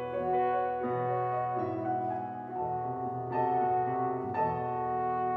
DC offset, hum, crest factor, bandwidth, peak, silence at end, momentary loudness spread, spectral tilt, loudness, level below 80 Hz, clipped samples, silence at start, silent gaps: under 0.1%; none; 12 dB; 4.8 kHz; -18 dBFS; 0 s; 6 LU; -10 dB/octave; -32 LUFS; -68 dBFS; under 0.1%; 0 s; none